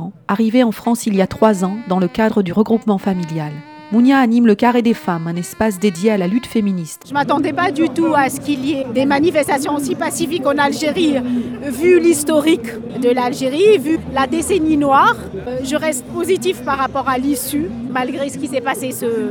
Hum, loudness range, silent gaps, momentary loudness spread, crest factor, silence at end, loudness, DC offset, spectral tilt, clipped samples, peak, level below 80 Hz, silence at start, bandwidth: none; 3 LU; none; 9 LU; 16 dB; 0 s; -16 LUFS; under 0.1%; -5 dB/octave; under 0.1%; 0 dBFS; -48 dBFS; 0 s; over 20 kHz